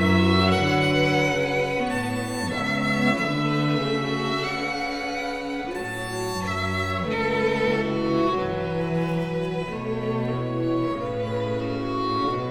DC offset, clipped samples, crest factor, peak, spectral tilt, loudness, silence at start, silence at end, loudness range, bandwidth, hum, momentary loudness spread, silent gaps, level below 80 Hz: under 0.1%; under 0.1%; 18 dB; -6 dBFS; -6 dB/octave; -24 LUFS; 0 s; 0 s; 4 LU; over 20 kHz; none; 8 LU; none; -48 dBFS